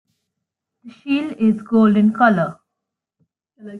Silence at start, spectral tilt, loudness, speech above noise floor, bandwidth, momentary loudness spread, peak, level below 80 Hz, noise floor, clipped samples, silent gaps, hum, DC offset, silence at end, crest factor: 0.85 s; -8.5 dB/octave; -17 LUFS; 65 dB; 4.6 kHz; 10 LU; -2 dBFS; -64 dBFS; -82 dBFS; under 0.1%; none; none; under 0.1%; 0 s; 18 dB